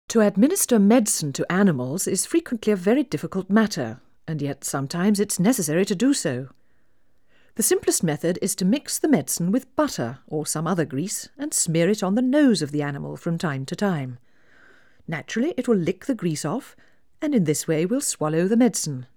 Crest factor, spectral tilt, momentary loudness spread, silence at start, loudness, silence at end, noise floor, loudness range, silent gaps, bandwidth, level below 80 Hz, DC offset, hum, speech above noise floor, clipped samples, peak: 18 dB; -5 dB/octave; 11 LU; 0.1 s; -23 LUFS; 0.1 s; -67 dBFS; 5 LU; none; over 20 kHz; -64 dBFS; 0.2%; none; 45 dB; under 0.1%; -4 dBFS